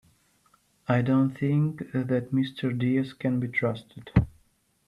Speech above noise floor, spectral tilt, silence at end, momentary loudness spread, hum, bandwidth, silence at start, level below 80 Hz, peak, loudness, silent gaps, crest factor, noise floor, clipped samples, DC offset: 41 dB; -9 dB/octave; 0.6 s; 7 LU; none; 11 kHz; 0.9 s; -46 dBFS; -6 dBFS; -27 LUFS; none; 22 dB; -67 dBFS; under 0.1%; under 0.1%